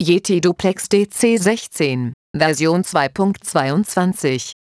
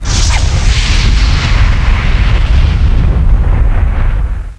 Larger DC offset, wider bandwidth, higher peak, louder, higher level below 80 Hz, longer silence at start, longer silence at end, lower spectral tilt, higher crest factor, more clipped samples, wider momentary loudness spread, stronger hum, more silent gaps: neither; about the same, 11 kHz vs 10 kHz; about the same, -2 dBFS vs 0 dBFS; second, -18 LUFS vs -12 LUFS; second, -54 dBFS vs -10 dBFS; about the same, 0 s vs 0 s; first, 0.2 s vs 0.05 s; about the same, -5 dB/octave vs -4.5 dB/octave; first, 16 dB vs 8 dB; second, under 0.1% vs 0.2%; about the same, 5 LU vs 3 LU; neither; first, 2.14-2.34 s vs none